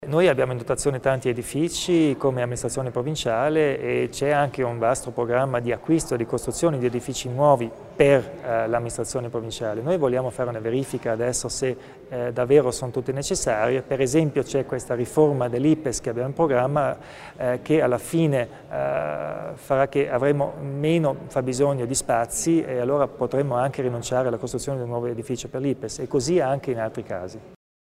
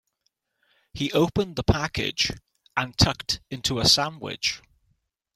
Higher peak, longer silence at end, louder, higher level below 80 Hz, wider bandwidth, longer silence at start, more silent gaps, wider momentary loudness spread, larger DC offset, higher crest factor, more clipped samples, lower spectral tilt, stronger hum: about the same, -2 dBFS vs -4 dBFS; second, 0.35 s vs 0.8 s; about the same, -24 LUFS vs -24 LUFS; second, -50 dBFS vs -42 dBFS; about the same, 16 kHz vs 16 kHz; second, 0 s vs 0.95 s; neither; second, 8 LU vs 12 LU; neither; about the same, 20 dB vs 24 dB; neither; first, -5.5 dB/octave vs -3.5 dB/octave; neither